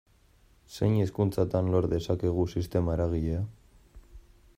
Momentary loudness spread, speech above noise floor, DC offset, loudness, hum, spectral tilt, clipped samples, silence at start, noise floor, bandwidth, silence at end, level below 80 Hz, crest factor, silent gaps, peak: 6 LU; 34 dB; under 0.1%; -29 LUFS; none; -8.5 dB/octave; under 0.1%; 0.7 s; -61 dBFS; 15.5 kHz; 0.35 s; -48 dBFS; 18 dB; none; -12 dBFS